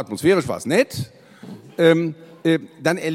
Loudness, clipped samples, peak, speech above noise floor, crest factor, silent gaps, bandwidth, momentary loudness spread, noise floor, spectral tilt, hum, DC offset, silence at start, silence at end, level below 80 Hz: -20 LUFS; under 0.1%; -2 dBFS; 21 dB; 18 dB; none; 16 kHz; 18 LU; -40 dBFS; -5.5 dB/octave; none; under 0.1%; 0 s; 0 s; -58 dBFS